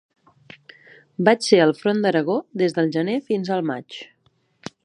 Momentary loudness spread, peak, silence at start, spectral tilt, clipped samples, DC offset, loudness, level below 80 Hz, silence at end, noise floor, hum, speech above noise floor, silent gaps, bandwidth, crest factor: 22 LU; -2 dBFS; 1.2 s; -5.5 dB/octave; under 0.1%; under 0.1%; -20 LUFS; -72 dBFS; 0.8 s; -64 dBFS; none; 45 dB; none; 11 kHz; 22 dB